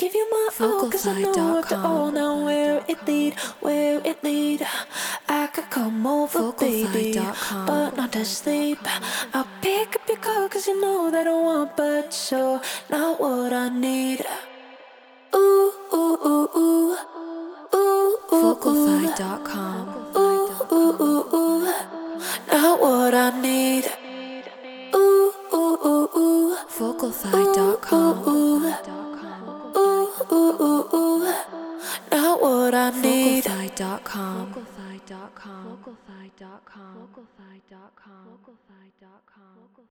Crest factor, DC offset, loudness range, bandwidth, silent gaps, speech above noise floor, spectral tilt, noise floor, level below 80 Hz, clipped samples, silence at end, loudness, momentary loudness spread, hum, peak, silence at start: 20 dB; under 0.1%; 4 LU; over 20 kHz; none; 33 dB; -4 dB/octave; -56 dBFS; -66 dBFS; under 0.1%; 2.7 s; -22 LUFS; 14 LU; none; -2 dBFS; 0 s